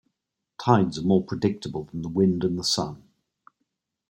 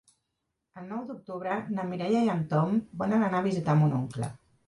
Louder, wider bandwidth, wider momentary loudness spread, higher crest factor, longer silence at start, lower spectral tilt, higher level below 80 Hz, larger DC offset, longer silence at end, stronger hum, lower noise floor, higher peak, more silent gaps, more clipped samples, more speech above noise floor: first, -25 LUFS vs -29 LUFS; first, 16.5 kHz vs 11 kHz; about the same, 11 LU vs 13 LU; first, 22 dB vs 16 dB; second, 0.6 s vs 0.75 s; second, -6 dB/octave vs -8 dB/octave; first, -58 dBFS vs -64 dBFS; neither; first, 1.1 s vs 0.3 s; neither; about the same, -82 dBFS vs -82 dBFS; first, -4 dBFS vs -12 dBFS; neither; neither; first, 59 dB vs 54 dB